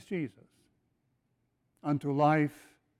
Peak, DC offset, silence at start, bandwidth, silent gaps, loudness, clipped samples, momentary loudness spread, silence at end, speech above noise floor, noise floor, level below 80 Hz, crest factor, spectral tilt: -14 dBFS; under 0.1%; 0.1 s; 13 kHz; none; -30 LUFS; under 0.1%; 13 LU; 0.5 s; 47 dB; -77 dBFS; -76 dBFS; 20 dB; -8 dB/octave